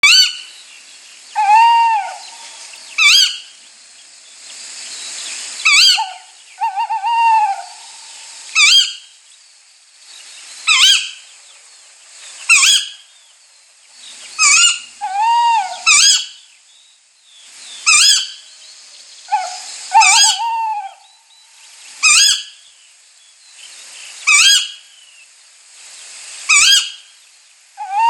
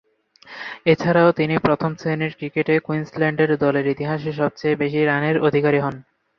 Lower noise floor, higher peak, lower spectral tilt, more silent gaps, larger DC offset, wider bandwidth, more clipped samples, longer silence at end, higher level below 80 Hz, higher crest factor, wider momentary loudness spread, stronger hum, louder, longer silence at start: about the same, -50 dBFS vs -48 dBFS; about the same, 0 dBFS vs -2 dBFS; second, 5.5 dB/octave vs -8 dB/octave; neither; neither; first, 19 kHz vs 6.6 kHz; neither; second, 0 s vs 0.35 s; second, -66 dBFS vs -56 dBFS; about the same, 16 dB vs 18 dB; first, 25 LU vs 8 LU; neither; first, -11 LUFS vs -20 LUFS; second, 0.05 s vs 0.45 s